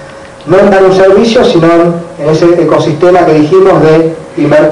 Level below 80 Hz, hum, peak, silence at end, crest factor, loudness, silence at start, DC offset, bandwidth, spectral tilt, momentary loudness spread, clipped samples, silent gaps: -36 dBFS; none; 0 dBFS; 0 s; 6 dB; -6 LUFS; 0 s; under 0.1%; 10.5 kHz; -7 dB/octave; 7 LU; 6%; none